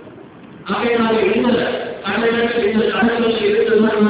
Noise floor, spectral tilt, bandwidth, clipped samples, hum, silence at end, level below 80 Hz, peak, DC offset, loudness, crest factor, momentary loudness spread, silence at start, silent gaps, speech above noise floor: -38 dBFS; -9.5 dB/octave; 4 kHz; under 0.1%; none; 0 s; -50 dBFS; -4 dBFS; under 0.1%; -16 LUFS; 14 dB; 7 LU; 0 s; none; 23 dB